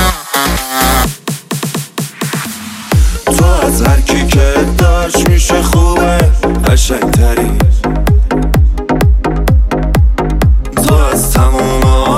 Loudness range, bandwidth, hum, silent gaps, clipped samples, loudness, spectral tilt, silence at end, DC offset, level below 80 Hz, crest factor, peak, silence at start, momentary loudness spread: 3 LU; 16.5 kHz; none; none; under 0.1%; -11 LUFS; -5 dB/octave; 0 s; under 0.1%; -12 dBFS; 10 dB; 0 dBFS; 0 s; 8 LU